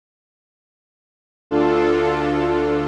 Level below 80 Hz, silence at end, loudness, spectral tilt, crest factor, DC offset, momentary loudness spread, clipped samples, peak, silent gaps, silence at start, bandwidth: -42 dBFS; 0 s; -19 LUFS; -7 dB/octave; 14 dB; under 0.1%; 3 LU; under 0.1%; -6 dBFS; none; 1.5 s; 8.4 kHz